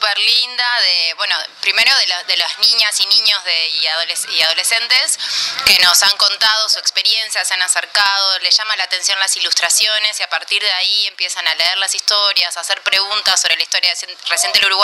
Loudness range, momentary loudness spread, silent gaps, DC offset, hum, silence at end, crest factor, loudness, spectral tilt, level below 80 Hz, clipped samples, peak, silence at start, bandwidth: 2 LU; 6 LU; none; under 0.1%; none; 0 s; 16 dB; -12 LUFS; 3.5 dB/octave; -58 dBFS; under 0.1%; 0 dBFS; 0 s; over 20 kHz